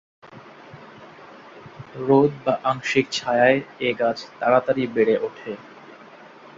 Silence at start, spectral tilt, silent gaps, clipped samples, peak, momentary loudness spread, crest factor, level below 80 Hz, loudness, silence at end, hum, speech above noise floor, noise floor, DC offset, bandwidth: 0.25 s; -5.5 dB/octave; none; under 0.1%; -4 dBFS; 24 LU; 20 dB; -64 dBFS; -21 LUFS; 0.55 s; none; 24 dB; -45 dBFS; under 0.1%; 7.8 kHz